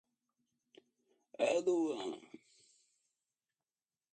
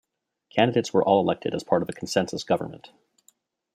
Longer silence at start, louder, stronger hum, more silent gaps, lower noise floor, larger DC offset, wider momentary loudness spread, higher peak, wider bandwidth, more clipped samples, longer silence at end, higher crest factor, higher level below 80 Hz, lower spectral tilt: first, 1.4 s vs 0.55 s; second, -36 LUFS vs -24 LUFS; neither; neither; first, under -90 dBFS vs -64 dBFS; neither; first, 18 LU vs 7 LU; second, -20 dBFS vs -4 dBFS; second, 9 kHz vs 14.5 kHz; neither; first, 1.9 s vs 1 s; about the same, 22 dB vs 20 dB; second, under -90 dBFS vs -66 dBFS; second, -4 dB/octave vs -5.5 dB/octave